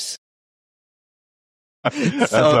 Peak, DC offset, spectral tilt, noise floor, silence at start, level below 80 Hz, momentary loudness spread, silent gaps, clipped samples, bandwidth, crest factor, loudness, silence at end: -4 dBFS; under 0.1%; -5 dB/octave; under -90 dBFS; 0 s; -62 dBFS; 14 LU; 0.18-1.83 s; under 0.1%; 14 kHz; 18 dB; -20 LUFS; 0 s